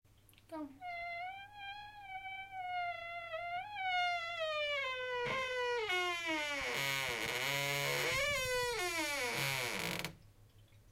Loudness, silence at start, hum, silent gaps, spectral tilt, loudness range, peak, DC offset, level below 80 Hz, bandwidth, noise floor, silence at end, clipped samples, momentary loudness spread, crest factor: -37 LUFS; 0.5 s; none; none; -2 dB/octave; 8 LU; -20 dBFS; under 0.1%; -64 dBFS; 16 kHz; -64 dBFS; 0.1 s; under 0.1%; 13 LU; 18 dB